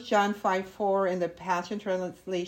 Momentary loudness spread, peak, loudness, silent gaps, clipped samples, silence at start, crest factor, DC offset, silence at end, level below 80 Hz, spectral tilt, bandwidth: 6 LU; -12 dBFS; -29 LUFS; none; under 0.1%; 0 s; 16 dB; under 0.1%; 0 s; -66 dBFS; -5 dB/octave; 16 kHz